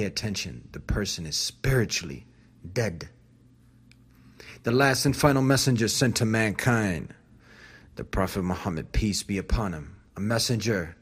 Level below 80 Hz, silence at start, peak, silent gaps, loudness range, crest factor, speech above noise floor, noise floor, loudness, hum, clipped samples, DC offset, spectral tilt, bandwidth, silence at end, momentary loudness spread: -40 dBFS; 0 s; -4 dBFS; none; 7 LU; 24 dB; 31 dB; -56 dBFS; -26 LUFS; none; under 0.1%; under 0.1%; -4.5 dB/octave; 15.5 kHz; 0.1 s; 18 LU